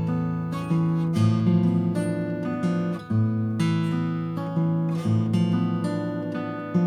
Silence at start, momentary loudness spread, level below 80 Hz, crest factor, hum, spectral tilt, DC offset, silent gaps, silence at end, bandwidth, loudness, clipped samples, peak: 0 s; 7 LU; -60 dBFS; 14 dB; none; -8.5 dB/octave; under 0.1%; none; 0 s; 10 kHz; -25 LUFS; under 0.1%; -10 dBFS